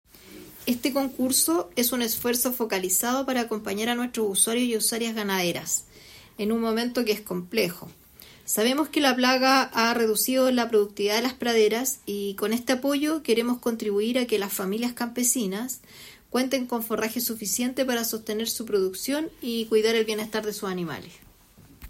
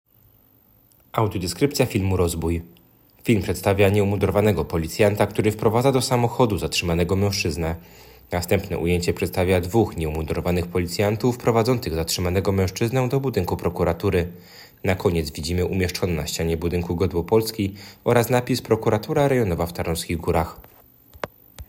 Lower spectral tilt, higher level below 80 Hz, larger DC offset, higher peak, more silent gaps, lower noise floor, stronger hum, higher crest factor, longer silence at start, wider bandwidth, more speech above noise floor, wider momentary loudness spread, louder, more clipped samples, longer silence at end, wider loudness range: second, -2.5 dB/octave vs -5.5 dB/octave; second, -62 dBFS vs -44 dBFS; neither; second, -8 dBFS vs -4 dBFS; neither; second, -53 dBFS vs -57 dBFS; neither; about the same, 18 dB vs 18 dB; second, 0.25 s vs 1.15 s; about the same, 16.5 kHz vs 17 kHz; second, 28 dB vs 35 dB; about the same, 9 LU vs 8 LU; second, -25 LUFS vs -22 LUFS; neither; about the same, 0 s vs 0.05 s; about the same, 5 LU vs 3 LU